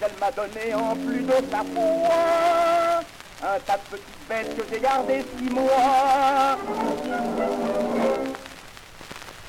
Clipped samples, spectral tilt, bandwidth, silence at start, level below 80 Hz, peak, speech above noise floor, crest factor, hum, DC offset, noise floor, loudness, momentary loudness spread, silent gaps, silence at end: under 0.1%; -4.5 dB/octave; 16.5 kHz; 0 s; -52 dBFS; -10 dBFS; 20 dB; 12 dB; none; under 0.1%; -43 dBFS; -23 LUFS; 19 LU; none; 0 s